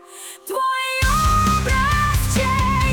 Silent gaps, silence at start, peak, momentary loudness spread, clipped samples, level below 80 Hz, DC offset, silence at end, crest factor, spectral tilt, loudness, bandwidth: none; 0.1 s; -8 dBFS; 9 LU; under 0.1%; -26 dBFS; under 0.1%; 0 s; 10 dB; -4 dB/octave; -18 LUFS; 19.5 kHz